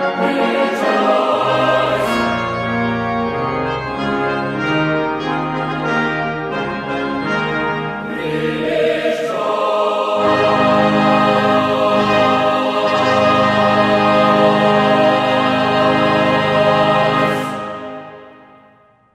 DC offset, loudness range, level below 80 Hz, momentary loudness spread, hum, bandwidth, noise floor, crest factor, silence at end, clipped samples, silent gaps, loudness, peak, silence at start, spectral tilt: under 0.1%; 6 LU; -46 dBFS; 8 LU; none; 14 kHz; -50 dBFS; 14 dB; 0.8 s; under 0.1%; none; -15 LUFS; -2 dBFS; 0 s; -6 dB/octave